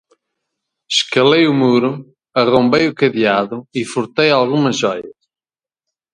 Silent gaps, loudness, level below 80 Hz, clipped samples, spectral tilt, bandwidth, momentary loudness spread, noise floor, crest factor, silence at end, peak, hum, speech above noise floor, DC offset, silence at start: none; -15 LUFS; -58 dBFS; under 0.1%; -5 dB/octave; 11 kHz; 9 LU; under -90 dBFS; 16 dB; 1.05 s; 0 dBFS; none; over 76 dB; under 0.1%; 0.9 s